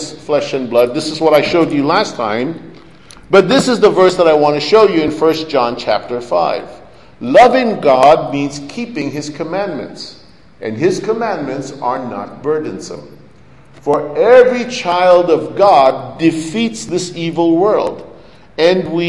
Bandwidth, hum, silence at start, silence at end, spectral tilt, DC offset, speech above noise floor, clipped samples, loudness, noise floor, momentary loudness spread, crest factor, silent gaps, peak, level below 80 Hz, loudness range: 12 kHz; none; 0 s; 0 s; -5 dB/octave; 0.7%; 30 dB; 0.2%; -13 LUFS; -43 dBFS; 15 LU; 14 dB; none; 0 dBFS; -50 dBFS; 8 LU